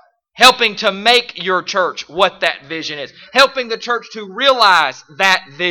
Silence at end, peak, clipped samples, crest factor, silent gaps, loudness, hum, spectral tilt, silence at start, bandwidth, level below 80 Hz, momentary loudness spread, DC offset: 0 s; 0 dBFS; 0.2%; 16 dB; none; -14 LUFS; none; -1.5 dB/octave; 0.35 s; 19.5 kHz; -56 dBFS; 13 LU; under 0.1%